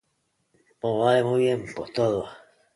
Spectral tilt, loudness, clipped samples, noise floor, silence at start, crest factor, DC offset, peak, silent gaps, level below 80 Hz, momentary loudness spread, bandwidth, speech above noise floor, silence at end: -6.5 dB/octave; -24 LUFS; under 0.1%; -73 dBFS; 0.85 s; 18 dB; under 0.1%; -8 dBFS; none; -62 dBFS; 11 LU; 11.5 kHz; 50 dB; 0.4 s